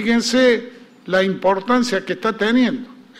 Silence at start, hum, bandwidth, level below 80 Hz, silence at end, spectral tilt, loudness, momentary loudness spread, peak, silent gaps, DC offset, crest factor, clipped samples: 0 s; none; 13 kHz; -56 dBFS; 0.25 s; -4.5 dB/octave; -18 LUFS; 7 LU; -4 dBFS; none; under 0.1%; 14 dB; under 0.1%